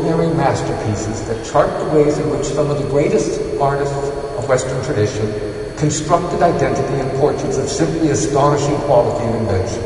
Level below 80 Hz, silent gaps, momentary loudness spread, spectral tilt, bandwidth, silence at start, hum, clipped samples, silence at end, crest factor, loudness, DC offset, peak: -36 dBFS; none; 7 LU; -6 dB/octave; 11 kHz; 0 s; none; under 0.1%; 0 s; 16 dB; -17 LUFS; under 0.1%; 0 dBFS